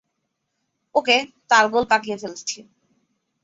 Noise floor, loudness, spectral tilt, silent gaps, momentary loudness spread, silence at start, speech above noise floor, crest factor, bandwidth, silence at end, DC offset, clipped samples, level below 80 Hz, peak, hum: -76 dBFS; -20 LUFS; -1.5 dB/octave; none; 14 LU; 0.95 s; 56 dB; 22 dB; 8 kHz; 0.8 s; under 0.1%; under 0.1%; -64 dBFS; -2 dBFS; none